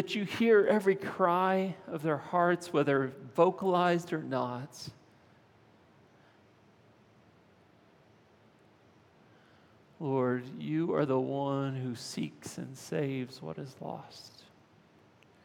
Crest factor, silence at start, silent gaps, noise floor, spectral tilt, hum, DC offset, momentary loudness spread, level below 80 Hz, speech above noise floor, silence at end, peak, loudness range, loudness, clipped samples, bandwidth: 22 dB; 0 s; none; -62 dBFS; -6.5 dB/octave; none; under 0.1%; 16 LU; -82 dBFS; 32 dB; 1.15 s; -12 dBFS; 12 LU; -31 LUFS; under 0.1%; 17.5 kHz